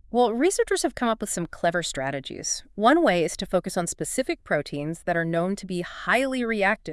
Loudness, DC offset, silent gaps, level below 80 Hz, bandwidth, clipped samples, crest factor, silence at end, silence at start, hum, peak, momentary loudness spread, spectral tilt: -25 LUFS; under 0.1%; none; -52 dBFS; 12 kHz; under 0.1%; 20 dB; 0 s; 0.1 s; none; -6 dBFS; 9 LU; -4 dB/octave